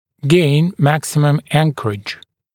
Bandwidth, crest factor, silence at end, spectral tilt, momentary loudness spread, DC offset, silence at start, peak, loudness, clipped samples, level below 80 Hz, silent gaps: 16.5 kHz; 16 dB; 0.4 s; -6 dB/octave; 13 LU; under 0.1%; 0.25 s; 0 dBFS; -15 LUFS; under 0.1%; -54 dBFS; none